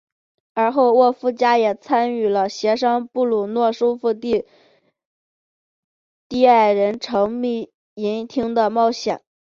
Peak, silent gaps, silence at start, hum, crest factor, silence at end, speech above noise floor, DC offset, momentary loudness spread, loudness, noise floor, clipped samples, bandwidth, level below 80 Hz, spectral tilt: -2 dBFS; 5.05-6.30 s, 7.74-7.96 s; 0.55 s; none; 18 dB; 0.4 s; over 72 dB; under 0.1%; 10 LU; -19 LUFS; under -90 dBFS; under 0.1%; 7.4 kHz; -62 dBFS; -5 dB/octave